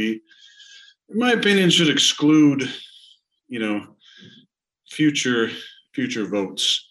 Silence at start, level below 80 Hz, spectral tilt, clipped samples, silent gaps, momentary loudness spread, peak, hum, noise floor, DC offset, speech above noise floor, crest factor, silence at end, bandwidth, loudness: 0 s; -74 dBFS; -3.5 dB/octave; under 0.1%; none; 18 LU; -6 dBFS; none; -60 dBFS; under 0.1%; 40 dB; 16 dB; 0.1 s; 12.5 kHz; -19 LUFS